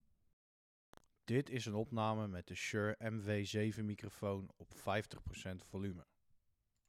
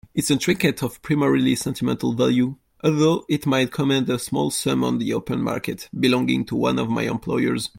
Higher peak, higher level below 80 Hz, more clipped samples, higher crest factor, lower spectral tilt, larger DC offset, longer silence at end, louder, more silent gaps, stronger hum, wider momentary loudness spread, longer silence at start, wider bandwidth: second, -24 dBFS vs -6 dBFS; second, -68 dBFS vs -54 dBFS; neither; about the same, 18 dB vs 16 dB; about the same, -6 dB/octave vs -5 dB/octave; neither; first, 0.85 s vs 0.1 s; second, -42 LUFS vs -22 LUFS; neither; neither; first, 10 LU vs 5 LU; first, 1.25 s vs 0.15 s; second, 14.5 kHz vs 17 kHz